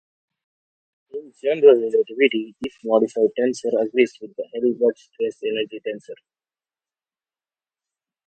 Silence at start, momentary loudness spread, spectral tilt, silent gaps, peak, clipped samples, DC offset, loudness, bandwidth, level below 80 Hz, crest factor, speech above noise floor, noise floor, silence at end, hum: 1.15 s; 17 LU; -5 dB/octave; none; -2 dBFS; under 0.1%; under 0.1%; -20 LUFS; 8.8 kHz; -74 dBFS; 20 dB; over 70 dB; under -90 dBFS; 2.15 s; none